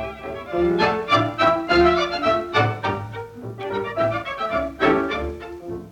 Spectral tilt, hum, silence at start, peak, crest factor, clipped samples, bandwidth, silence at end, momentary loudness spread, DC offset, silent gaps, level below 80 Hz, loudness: -6 dB/octave; none; 0 s; -6 dBFS; 16 dB; under 0.1%; 9.8 kHz; 0 s; 16 LU; under 0.1%; none; -42 dBFS; -21 LUFS